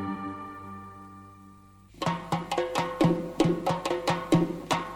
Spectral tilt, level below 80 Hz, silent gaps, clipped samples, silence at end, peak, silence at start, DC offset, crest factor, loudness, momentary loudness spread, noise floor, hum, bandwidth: -6 dB/octave; -56 dBFS; none; under 0.1%; 0 s; -10 dBFS; 0 s; under 0.1%; 20 dB; -28 LUFS; 18 LU; -53 dBFS; none; 16 kHz